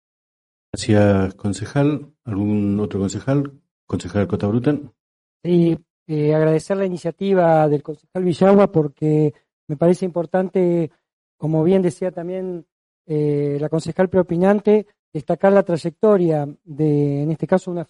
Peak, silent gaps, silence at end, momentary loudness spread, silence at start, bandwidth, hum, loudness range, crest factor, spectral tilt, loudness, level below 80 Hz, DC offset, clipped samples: -2 dBFS; 3.71-3.87 s, 5.00-5.40 s, 5.90-6.06 s, 9.53-9.67 s, 11.13-11.39 s, 12.72-13.05 s, 14.99-15.12 s; 0.05 s; 12 LU; 0.75 s; 11.5 kHz; none; 4 LU; 16 dB; -8 dB/octave; -19 LUFS; -54 dBFS; under 0.1%; under 0.1%